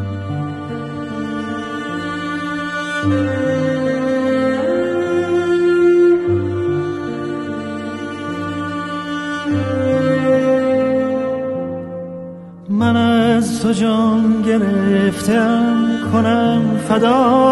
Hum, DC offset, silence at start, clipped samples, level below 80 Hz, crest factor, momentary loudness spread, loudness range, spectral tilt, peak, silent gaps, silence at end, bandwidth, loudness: none; under 0.1%; 0 s; under 0.1%; -52 dBFS; 14 dB; 11 LU; 6 LU; -6.5 dB/octave; -2 dBFS; none; 0 s; 12 kHz; -17 LUFS